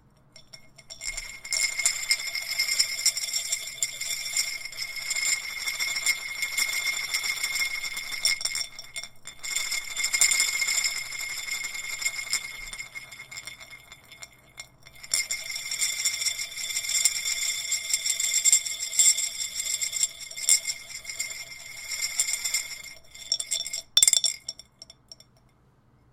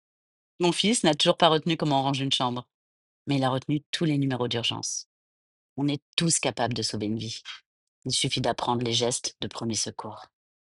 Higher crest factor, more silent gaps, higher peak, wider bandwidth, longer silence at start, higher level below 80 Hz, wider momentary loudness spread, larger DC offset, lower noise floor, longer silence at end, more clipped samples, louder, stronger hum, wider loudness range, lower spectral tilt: about the same, 24 dB vs 22 dB; second, none vs 2.74-3.25 s, 3.86-3.93 s, 5.06-5.76 s, 6.02-6.17 s, 7.66-8.02 s; about the same, -6 dBFS vs -4 dBFS; first, 17 kHz vs 11.5 kHz; second, 0.35 s vs 0.6 s; about the same, -60 dBFS vs -62 dBFS; about the same, 18 LU vs 16 LU; neither; second, -61 dBFS vs under -90 dBFS; first, 1 s vs 0.5 s; neither; about the same, -25 LUFS vs -26 LUFS; neither; first, 8 LU vs 4 LU; second, 3.5 dB/octave vs -4 dB/octave